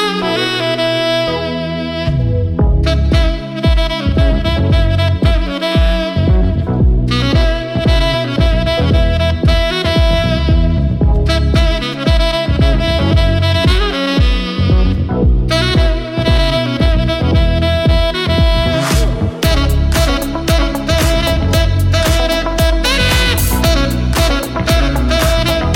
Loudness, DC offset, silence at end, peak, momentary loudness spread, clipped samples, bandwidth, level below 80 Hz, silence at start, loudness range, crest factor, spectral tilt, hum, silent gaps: -14 LUFS; under 0.1%; 0 s; -2 dBFS; 3 LU; under 0.1%; 17 kHz; -16 dBFS; 0 s; 1 LU; 10 dB; -5.5 dB/octave; none; none